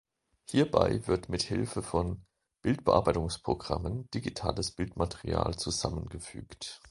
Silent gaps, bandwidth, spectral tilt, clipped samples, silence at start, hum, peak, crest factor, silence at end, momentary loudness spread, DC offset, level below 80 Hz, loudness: none; 11.5 kHz; -5.5 dB/octave; under 0.1%; 0.5 s; none; -6 dBFS; 24 dB; 0 s; 15 LU; under 0.1%; -46 dBFS; -31 LUFS